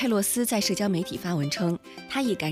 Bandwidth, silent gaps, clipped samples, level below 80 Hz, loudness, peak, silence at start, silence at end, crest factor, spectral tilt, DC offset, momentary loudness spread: 16 kHz; none; under 0.1%; -62 dBFS; -27 LUFS; -12 dBFS; 0 s; 0 s; 14 dB; -4.5 dB/octave; under 0.1%; 6 LU